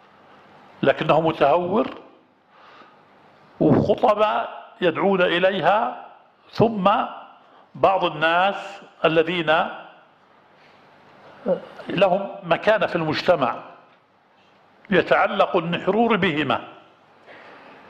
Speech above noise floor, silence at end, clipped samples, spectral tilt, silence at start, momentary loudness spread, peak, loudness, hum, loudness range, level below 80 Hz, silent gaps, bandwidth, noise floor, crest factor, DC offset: 37 dB; 0.35 s; under 0.1%; -7 dB/octave; 0.8 s; 11 LU; -4 dBFS; -21 LUFS; none; 4 LU; -58 dBFS; none; 8.8 kHz; -58 dBFS; 20 dB; under 0.1%